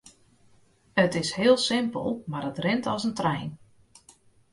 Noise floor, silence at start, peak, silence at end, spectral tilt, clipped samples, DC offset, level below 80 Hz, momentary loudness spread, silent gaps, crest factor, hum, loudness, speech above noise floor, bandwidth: -60 dBFS; 0.95 s; -6 dBFS; 0.95 s; -5 dB/octave; under 0.1%; under 0.1%; -62 dBFS; 10 LU; none; 20 dB; none; -26 LUFS; 35 dB; 11.5 kHz